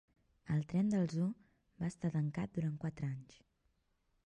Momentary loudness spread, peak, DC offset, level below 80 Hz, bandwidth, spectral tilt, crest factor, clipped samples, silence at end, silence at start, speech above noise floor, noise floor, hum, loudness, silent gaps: 9 LU; -24 dBFS; under 0.1%; -68 dBFS; 9.6 kHz; -8.5 dB/octave; 16 dB; under 0.1%; 1.05 s; 0.45 s; 42 dB; -79 dBFS; none; -38 LUFS; none